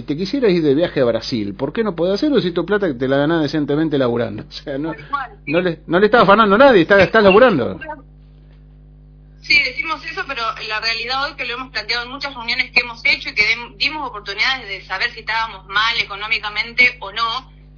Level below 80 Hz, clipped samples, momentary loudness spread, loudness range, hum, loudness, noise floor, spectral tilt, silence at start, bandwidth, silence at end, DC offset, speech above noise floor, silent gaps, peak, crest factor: -44 dBFS; under 0.1%; 14 LU; 7 LU; none; -16 LUFS; -43 dBFS; -5.5 dB/octave; 0 s; 5.4 kHz; 0.35 s; under 0.1%; 26 dB; none; 0 dBFS; 18 dB